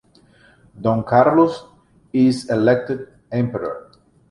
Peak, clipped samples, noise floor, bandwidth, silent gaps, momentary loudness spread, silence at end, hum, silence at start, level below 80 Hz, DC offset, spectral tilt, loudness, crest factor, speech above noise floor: -2 dBFS; under 0.1%; -52 dBFS; 11.5 kHz; none; 14 LU; 0.5 s; none; 0.75 s; -54 dBFS; under 0.1%; -7.5 dB/octave; -19 LUFS; 18 dB; 35 dB